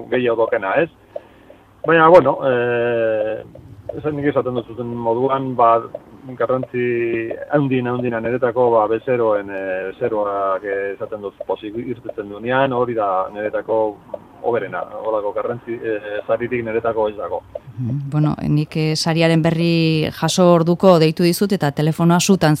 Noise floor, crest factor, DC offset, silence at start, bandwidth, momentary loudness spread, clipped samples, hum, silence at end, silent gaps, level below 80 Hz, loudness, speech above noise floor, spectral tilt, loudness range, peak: -46 dBFS; 18 dB; under 0.1%; 0 s; 15.5 kHz; 14 LU; under 0.1%; none; 0 s; none; -54 dBFS; -18 LUFS; 28 dB; -6 dB/octave; 7 LU; 0 dBFS